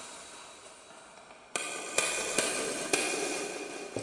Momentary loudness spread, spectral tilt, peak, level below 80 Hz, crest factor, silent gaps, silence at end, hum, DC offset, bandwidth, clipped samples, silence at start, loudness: 21 LU; -1 dB/octave; -12 dBFS; -70 dBFS; 24 dB; none; 0 s; none; under 0.1%; 11.5 kHz; under 0.1%; 0 s; -31 LUFS